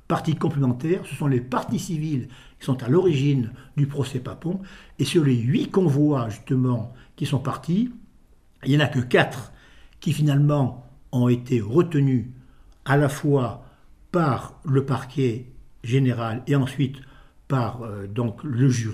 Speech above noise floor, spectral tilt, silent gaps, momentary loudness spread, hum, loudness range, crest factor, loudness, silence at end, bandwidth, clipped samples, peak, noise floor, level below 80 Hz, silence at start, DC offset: 32 dB; -7 dB/octave; none; 11 LU; none; 2 LU; 20 dB; -23 LUFS; 0 s; 13 kHz; under 0.1%; -2 dBFS; -54 dBFS; -52 dBFS; 0.1 s; under 0.1%